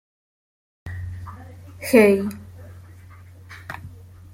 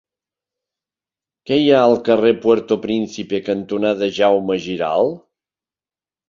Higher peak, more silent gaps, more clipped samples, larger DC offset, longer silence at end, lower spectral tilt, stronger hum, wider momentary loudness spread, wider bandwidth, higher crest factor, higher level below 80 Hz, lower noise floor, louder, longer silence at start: about the same, -2 dBFS vs 0 dBFS; neither; neither; neither; second, 0.35 s vs 1.1 s; about the same, -6 dB/octave vs -6 dB/octave; neither; first, 27 LU vs 9 LU; first, 16.5 kHz vs 7.4 kHz; about the same, 22 dB vs 18 dB; first, -52 dBFS vs -58 dBFS; second, -44 dBFS vs under -90 dBFS; about the same, -19 LUFS vs -17 LUFS; second, 0.85 s vs 1.45 s